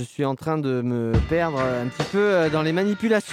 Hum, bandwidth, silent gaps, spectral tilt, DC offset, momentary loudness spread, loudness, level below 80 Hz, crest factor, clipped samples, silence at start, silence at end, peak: none; 15.5 kHz; none; -6.5 dB/octave; under 0.1%; 5 LU; -23 LUFS; -38 dBFS; 14 dB; under 0.1%; 0 s; 0 s; -8 dBFS